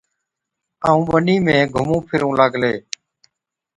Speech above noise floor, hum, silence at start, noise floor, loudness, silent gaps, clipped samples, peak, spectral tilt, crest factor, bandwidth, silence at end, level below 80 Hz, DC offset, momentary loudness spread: 64 dB; none; 0.8 s; -80 dBFS; -17 LUFS; none; under 0.1%; 0 dBFS; -6 dB/octave; 18 dB; 11 kHz; 1 s; -48 dBFS; under 0.1%; 10 LU